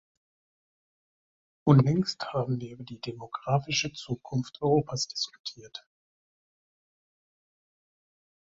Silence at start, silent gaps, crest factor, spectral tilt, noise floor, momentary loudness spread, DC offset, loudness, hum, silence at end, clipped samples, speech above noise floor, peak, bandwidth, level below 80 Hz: 1.65 s; 5.39-5.44 s; 24 dB; -5.5 dB/octave; under -90 dBFS; 18 LU; under 0.1%; -28 LUFS; none; 2.7 s; under 0.1%; over 62 dB; -6 dBFS; 7.8 kHz; -64 dBFS